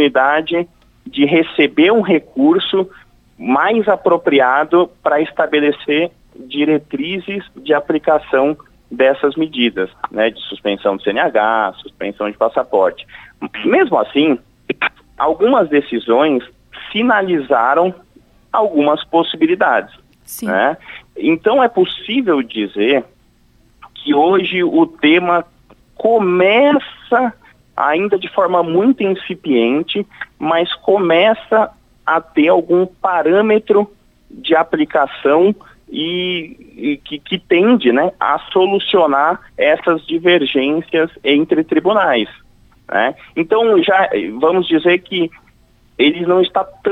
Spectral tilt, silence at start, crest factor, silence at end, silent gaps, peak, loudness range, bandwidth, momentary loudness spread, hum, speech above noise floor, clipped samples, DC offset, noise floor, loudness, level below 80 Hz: -6 dB/octave; 0 s; 14 dB; 0 s; none; -2 dBFS; 3 LU; 13.5 kHz; 10 LU; none; 38 dB; under 0.1%; under 0.1%; -52 dBFS; -15 LUFS; -54 dBFS